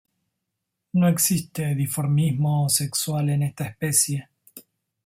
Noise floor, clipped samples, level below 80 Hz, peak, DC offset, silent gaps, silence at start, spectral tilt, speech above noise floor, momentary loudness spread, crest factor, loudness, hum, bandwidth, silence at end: -81 dBFS; under 0.1%; -60 dBFS; -6 dBFS; under 0.1%; none; 0.95 s; -4.5 dB/octave; 59 dB; 7 LU; 18 dB; -22 LUFS; none; 16.5 kHz; 0.45 s